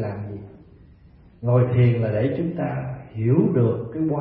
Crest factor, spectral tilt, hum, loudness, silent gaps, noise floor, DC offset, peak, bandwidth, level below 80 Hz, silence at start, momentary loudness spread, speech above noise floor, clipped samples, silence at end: 16 dB; -13.5 dB/octave; none; -22 LUFS; none; -50 dBFS; under 0.1%; -6 dBFS; 3.8 kHz; -52 dBFS; 0 s; 14 LU; 30 dB; under 0.1%; 0 s